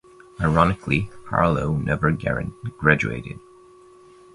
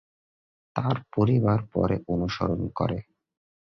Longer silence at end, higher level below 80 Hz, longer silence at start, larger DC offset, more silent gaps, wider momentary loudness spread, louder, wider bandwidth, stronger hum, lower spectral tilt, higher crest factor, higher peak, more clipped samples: first, 0.95 s vs 0.75 s; first, -40 dBFS vs -48 dBFS; second, 0.4 s vs 0.75 s; neither; neither; first, 12 LU vs 7 LU; first, -22 LUFS vs -27 LUFS; first, 11 kHz vs 6.2 kHz; neither; about the same, -7.5 dB/octave vs -8.5 dB/octave; about the same, 22 dB vs 18 dB; first, 0 dBFS vs -8 dBFS; neither